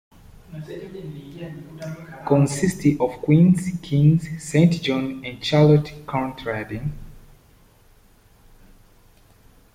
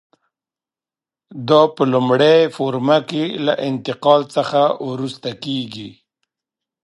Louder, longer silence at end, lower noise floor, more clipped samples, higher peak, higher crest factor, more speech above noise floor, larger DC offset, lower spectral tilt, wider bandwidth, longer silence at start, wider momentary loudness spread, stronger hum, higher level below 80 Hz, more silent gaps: second, -20 LUFS vs -17 LUFS; first, 2.55 s vs 0.95 s; second, -54 dBFS vs under -90 dBFS; neither; second, -4 dBFS vs 0 dBFS; about the same, 18 dB vs 18 dB; second, 33 dB vs over 73 dB; neither; about the same, -7 dB/octave vs -6.5 dB/octave; first, 14.5 kHz vs 11.5 kHz; second, 0.5 s vs 1.3 s; first, 20 LU vs 13 LU; neither; first, -48 dBFS vs -66 dBFS; neither